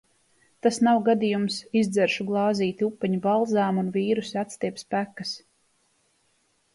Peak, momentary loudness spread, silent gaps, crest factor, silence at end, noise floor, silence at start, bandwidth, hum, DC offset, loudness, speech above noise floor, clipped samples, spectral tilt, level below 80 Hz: -8 dBFS; 10 LU; none; 16 dB; 1.35 s; -68 dBFS; 0.65 s; 11.5 kHz; none; under 0.1%; -25 LUFS; 44 dB; under 0.1%; -5.5 dB/octave; -70 dBFS